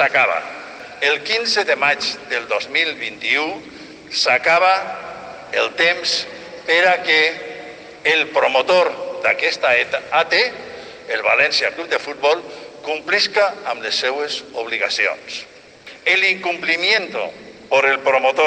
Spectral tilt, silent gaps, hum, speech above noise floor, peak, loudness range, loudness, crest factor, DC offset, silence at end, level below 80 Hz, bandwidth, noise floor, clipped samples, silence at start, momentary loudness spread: -1.5 dB/octave; none; none; 23 dB; -4 dBFS; 3 LU; -17 LUFS; 16 dB; under 0.1%; 0 s; -64 dBFS; 9.6 kHz; -41 dBFS; under 0.1%; 0 s; 16 LU